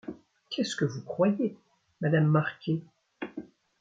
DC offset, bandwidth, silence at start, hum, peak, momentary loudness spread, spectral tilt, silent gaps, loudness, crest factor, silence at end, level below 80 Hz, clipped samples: under 0.1%; 7.8 kHz; 0.05 s; none; -10 dBFS; 16 LU; -6.5 dB/octave; none; -29 LUFS; 20 dB; 0.4 s; -72 dBFS; under 0.1%